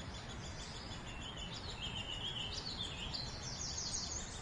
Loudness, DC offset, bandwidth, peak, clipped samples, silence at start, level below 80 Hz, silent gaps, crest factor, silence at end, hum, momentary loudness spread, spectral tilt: -42 LUFS; under 0.1%; 11.5 kHz; -28 dBFS; under 0.1%; 0 s; -54 dBFS; none; 16 dB; 0 s; none; 7 LU; -2.5 dB/octave